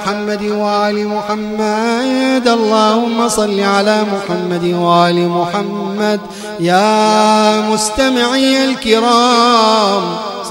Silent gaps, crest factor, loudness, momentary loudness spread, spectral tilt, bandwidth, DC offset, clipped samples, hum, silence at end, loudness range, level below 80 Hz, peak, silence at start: none; 12 dB; -13 LUFS; 8 LU; -4 dB/octave; 16.5 kHz; under 0.1%; under 0.1%; none; 0 s; 3 LU; -46 dBFS; 0 dBFS; 0 s